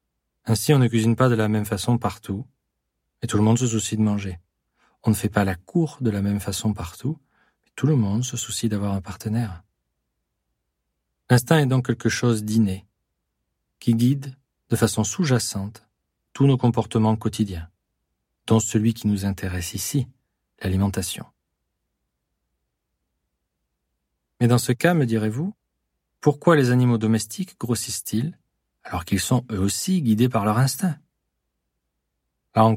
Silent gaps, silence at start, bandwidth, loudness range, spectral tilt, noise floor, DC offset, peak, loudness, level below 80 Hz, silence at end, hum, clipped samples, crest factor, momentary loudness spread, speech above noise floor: none; 0.45 s; 16.5 kHz; 5 LU; -6 dB/octave; -78 dBFS; under 0.1%; -2 dBFS; -22 LUFS; -52 dBFS; 0 s; none; under 0.1%; 20 dB; 13 LU; 57 dB